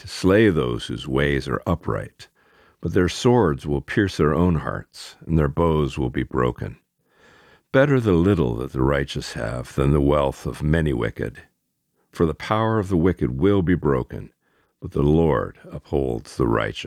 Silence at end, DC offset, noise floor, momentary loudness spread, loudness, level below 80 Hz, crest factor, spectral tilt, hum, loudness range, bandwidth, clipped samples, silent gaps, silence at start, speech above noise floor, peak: 0 s; under 0.1%; -72 dBFS; 12 LU; -21 LUFS; -36 dBFS; 18 dB; -7 dB/octave; none; 2 LU; 14.5 kHz; under 0.1%; none; 0.05 s; 51 dB; -4 dBFS